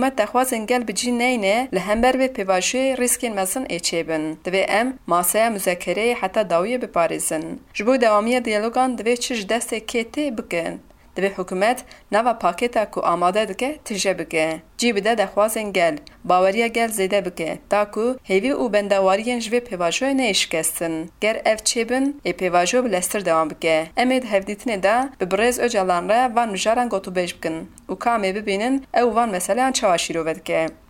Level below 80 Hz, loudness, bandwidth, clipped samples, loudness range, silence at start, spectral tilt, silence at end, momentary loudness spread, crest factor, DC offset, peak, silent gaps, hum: -52 dBFS; -21 LUFS; 17 kHz; under 0.1%; 2 LU; 0 s; -3 dB/octave; 0.15 s; 7 LU; 16 dB; under 0.1%; -4 dBFS; none; none